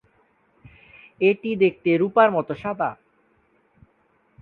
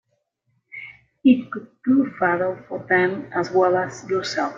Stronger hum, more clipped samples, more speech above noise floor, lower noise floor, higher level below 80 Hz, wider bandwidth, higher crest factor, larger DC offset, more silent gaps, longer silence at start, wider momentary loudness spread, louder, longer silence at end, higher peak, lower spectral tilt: neither; neither; second, 43 dB vs 50 dB; second, -64 dBFS vs -71 dBFS; about the same, -64 dBFS vs -64 dBFS; second, 4.5 kHz vs 7.6 kHz; about the same, 22 dB vs 18 dB; neither; neither; first, 1.2 s vs 0.75 s; second, 10 LU vs 19 LU; about the same, -21 LUFS vs -21 LUFS; first, 1.5 s vs 0 s; about the same, -2 dBFS vs -4 dBFS; first, -9 dB/octave vs -5.5 dB/octave